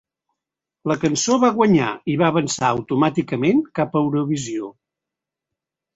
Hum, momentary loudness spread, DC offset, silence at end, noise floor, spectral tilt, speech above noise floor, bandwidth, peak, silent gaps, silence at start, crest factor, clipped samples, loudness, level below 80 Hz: none; 8 LU; under 0.1%; 1.25 s; -86 dBFS; -5.5 dB/octave; 67 dB; 8 kHz; -4 dBFS; none; 0.85 s; 18 dB; under 0.1%; -19 LUFS; -58 dBFS